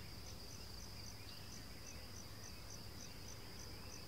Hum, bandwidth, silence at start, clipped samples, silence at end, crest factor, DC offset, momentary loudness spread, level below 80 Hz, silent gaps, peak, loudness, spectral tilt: none; 16 kHz; 0 s; under 0.1%; 0 s; 14 dB; 0.2%; 1 LU; -60 dBFS; none; -38 dBFS; -53 LUFS; -3 dB/octave